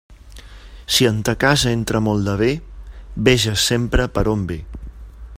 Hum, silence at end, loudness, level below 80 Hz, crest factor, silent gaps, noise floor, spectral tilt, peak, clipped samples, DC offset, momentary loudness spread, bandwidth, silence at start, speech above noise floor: none; 0 s; -18 LUFS; -32 dBFS; 20 dB; none; -39 dBFS; -4.5 dB/octave; 0 dBFS; under 0.1%; under 0.1%; 18 LU; 16 kHz; 0.1 s; 22 dB